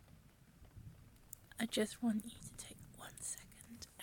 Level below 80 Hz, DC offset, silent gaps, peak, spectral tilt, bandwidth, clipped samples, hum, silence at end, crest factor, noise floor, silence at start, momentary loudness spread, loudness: -66 dBFS; under 0.1%; none; -24 dBFS; -3.5 dB/octave; 17.5 kHz; under 0.1%; none; 0 s; 20 dB; -64 dBFS; 0 s; 24 LU; -43 LUFS